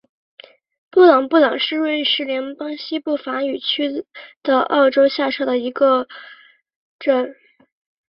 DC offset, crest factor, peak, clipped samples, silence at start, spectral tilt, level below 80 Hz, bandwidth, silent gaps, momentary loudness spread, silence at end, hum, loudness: under 0.1%; 18 dB; -2 dBFS; under 0.1%; 0.95 s; -6 dB/octave; -68 dBFS; 5.8 kHz; 4.36-4.41 s, 6.76-6.99 s; 14 LU; 0.75 s; none; -18 LUFS